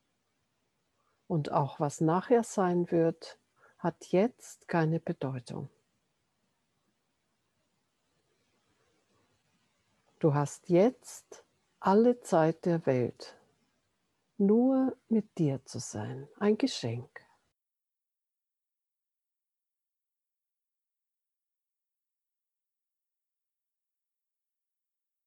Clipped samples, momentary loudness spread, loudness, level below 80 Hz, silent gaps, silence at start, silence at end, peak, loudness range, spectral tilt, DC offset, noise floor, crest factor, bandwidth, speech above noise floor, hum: under 0.1%; 17 LU; -30 LUFS; -78 dBFS; none; 1.3 s; 8.2 s; -12 dBFS; 9 LU; -7 dB/octave; under 0.1%; -89 dBFS; 22 dB; 12.5 kHz; 60 dB; none